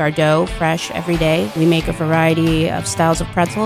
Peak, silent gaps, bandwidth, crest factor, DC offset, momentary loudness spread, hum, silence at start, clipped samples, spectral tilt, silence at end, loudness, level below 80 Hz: -2 dBFS; none; 15.5 kHz; 14 dB; under 0.1%; 4 LU; none; 0 s; under 0.1%; -5.5 dB/octave; 0 s; -16 LUFS; -34 dBFS